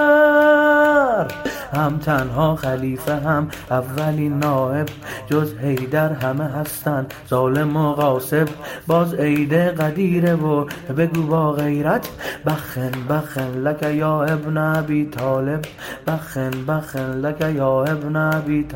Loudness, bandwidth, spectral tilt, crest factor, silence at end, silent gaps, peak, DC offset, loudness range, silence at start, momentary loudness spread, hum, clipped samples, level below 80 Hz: -20 LUFS; 16.5 kHz; -7 dB/octave; 16 dB; 0 s; none; -4 dBFS; under 0.1%; 3 LU; 0 s; 8 LU; none; under 0.1%; -48 dBFS